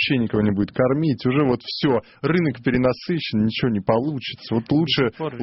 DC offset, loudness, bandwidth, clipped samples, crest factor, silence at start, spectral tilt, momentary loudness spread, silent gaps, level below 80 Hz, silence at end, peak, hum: under 0.1%; -21 LUFS; 6 kHz; under 0.1%; 16 dB; 0 s; -9 dB/octave; 4 LU; none; -50 dBFS; 0 s; -6 dBFS; none